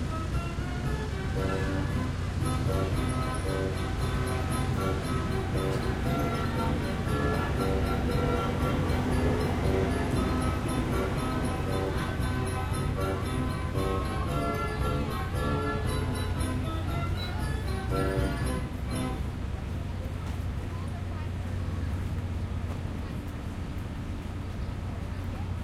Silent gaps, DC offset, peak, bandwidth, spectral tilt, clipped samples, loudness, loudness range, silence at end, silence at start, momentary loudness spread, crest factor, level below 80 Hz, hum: none; under 0.1%; -14 dBFS; 14.5 kHz; -6.5 dB/octave; under 0.1%; -31 LUFS; 6 LU; 0 s; 0 s; 7 LU; 14 dB; -36 dBFS; none